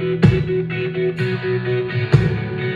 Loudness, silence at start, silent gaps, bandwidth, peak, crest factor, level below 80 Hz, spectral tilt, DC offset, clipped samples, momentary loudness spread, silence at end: -19 LUFS; 0 s; none; 7.6 kHz; 0 dBFS; 18 dB; -38 dBFS; -8.5 dB/octave; under 0.1%; under 0.1%; 6 LU; 0 s